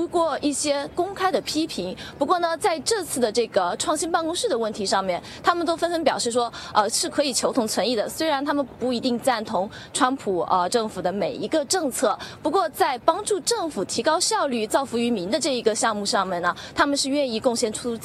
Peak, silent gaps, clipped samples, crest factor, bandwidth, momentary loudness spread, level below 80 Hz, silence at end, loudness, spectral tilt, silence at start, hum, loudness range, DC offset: -2 dBFS; none; under 0.1%; 20 dB; 13.5 kHz; 4 LU; -58 dBFS; 0 s; -23 LUFS; -2.5 dB/octave; 0 s; none; 1 LU; under 0.1%